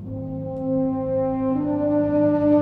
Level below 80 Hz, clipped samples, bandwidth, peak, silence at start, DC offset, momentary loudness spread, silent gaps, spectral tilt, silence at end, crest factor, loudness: -48 dBFS; under 0.1%; 3.6 kHz; -8 dBFS; 0 s; under 0.1%; 10 LU; none; -11.5 dB/octave; 0 s; 14 dB; -22 LUFS